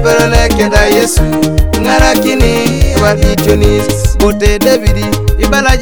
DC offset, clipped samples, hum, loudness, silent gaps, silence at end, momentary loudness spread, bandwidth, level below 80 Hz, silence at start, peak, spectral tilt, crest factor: 3%; 1%; none; -10 LUFS; none; 0 s; 4 LU; over 20 kHz; -14 dBFS; 0 s; 0 dBFS; -5 dB/octave; 8 dB